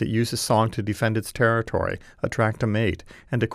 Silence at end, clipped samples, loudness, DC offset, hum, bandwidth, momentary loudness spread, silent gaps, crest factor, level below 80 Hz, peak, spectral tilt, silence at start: 0 s; under 0.1%; -24 LUFS; under 0.1%; none; 15.5 kHz; 8 LU; none; 18 dB; -46 dBFS; -6 dBFS; -5.5 dB/octave; 0 s